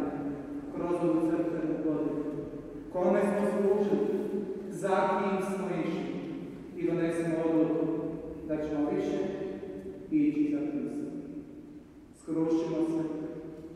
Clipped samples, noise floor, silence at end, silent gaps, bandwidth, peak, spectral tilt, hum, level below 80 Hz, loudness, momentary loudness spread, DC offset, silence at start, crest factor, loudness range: under 0.1%; -52 dBFS; 0 s; none; 12 kHz; -14 dBFS; -7.5 dB/octave; none; -60 dBFS; -31 LUFS; 14 LU; under 0.1%; 0 s; 16 dB; 4 LU